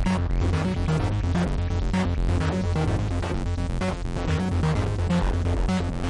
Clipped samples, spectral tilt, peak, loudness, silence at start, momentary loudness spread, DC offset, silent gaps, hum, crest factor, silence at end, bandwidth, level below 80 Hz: under 0.1%; -7 dB/octave; -14 dBFS; -26 LUFS; 0 s; 4 LU; under 0.1%; none; none; 10 dB; 0 s; 11 kHz; -30 dBFS